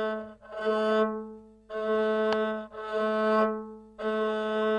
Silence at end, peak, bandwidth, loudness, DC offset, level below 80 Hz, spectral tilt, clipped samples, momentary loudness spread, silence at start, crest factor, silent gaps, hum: 0 s; -14 dBFS; 9.8 kHz; -29 LUFS; under 0.1%; -66 dBFS; -6 dB/octave; under 0.1%; 13 LU; 0 s; 16 dB; none; none